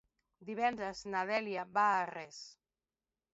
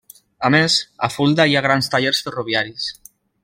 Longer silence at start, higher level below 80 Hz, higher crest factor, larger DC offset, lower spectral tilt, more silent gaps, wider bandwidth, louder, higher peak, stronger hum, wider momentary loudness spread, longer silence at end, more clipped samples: about the same, 0.4 s vs 0.4 s; second, -74 dBFS vs -58 dBFS; about the same, 18 dB vs 18 dB; neither; second, -2 dB/octave vs -4 dB/octave; neither; second, 8 kHz vs 16.5 kHz; second, -35 LUFS vs -18 LUFS; second, -18 dBFS vs -2 dBFS; neither; first, 19 LU vs 10 LU; first, 0.8 s vs 0.5 s; neither